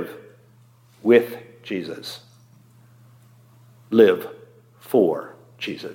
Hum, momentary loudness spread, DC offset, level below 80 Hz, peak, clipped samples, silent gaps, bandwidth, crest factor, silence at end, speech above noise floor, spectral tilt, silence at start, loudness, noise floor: none; 22 LU; under 0.1%; -76 dBFS; -2 dBFS; under 0.1%; none; 17 kHz; 22 dB; 0 s; 34 dB; -6 dB/octave; 0 s; -21 LUFS; -54 dBFS